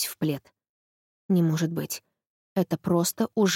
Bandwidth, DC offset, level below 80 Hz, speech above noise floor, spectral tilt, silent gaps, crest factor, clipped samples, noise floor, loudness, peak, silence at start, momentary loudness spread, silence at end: 17 kHz; under 0.1%; -68 dBFS; over 65 dB; -5.5 dB/octave; 0.69-1.29 s, 2.27-2.56 s; 16 dB; under 0.1%; under -90 dBFS; -27 LUFS; -10 dBFS; 0 s; 10 LU; 0 s